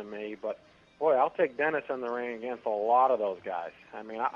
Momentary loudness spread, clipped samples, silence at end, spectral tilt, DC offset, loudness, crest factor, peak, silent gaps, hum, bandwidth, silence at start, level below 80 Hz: 15 LU; under 0.1%; 0 s; -6.5 dB/octave; under 0.1%; -30 LUFS; 18 dB; -12 dBFS; none; none; 6.8 kHz; 0 s; -74 dBFS